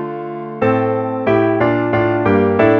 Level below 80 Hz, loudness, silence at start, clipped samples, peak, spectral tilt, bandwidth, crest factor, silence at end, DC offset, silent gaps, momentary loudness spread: -48 dBFS; -16 LUFS; 0 s; under 0.1%; 0 dBFS; -9.5 dB/octave; 6 kHz; 14 dB; 0 s; under 0.1%; none; 9 LU